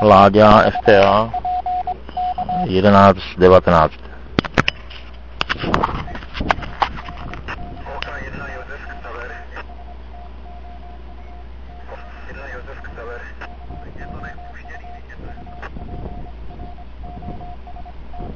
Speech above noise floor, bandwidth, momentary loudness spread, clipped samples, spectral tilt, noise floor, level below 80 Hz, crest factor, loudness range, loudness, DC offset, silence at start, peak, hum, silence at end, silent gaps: 24 dB; 7.4 kHz; 26 LU; under 0.1%; -7 dB/octave; -36 dBFS; -34 dBFS; 18 dB; 21 LU; -15 LUFS; 1%; 0 s; 0 dBFS; none; 0 s; none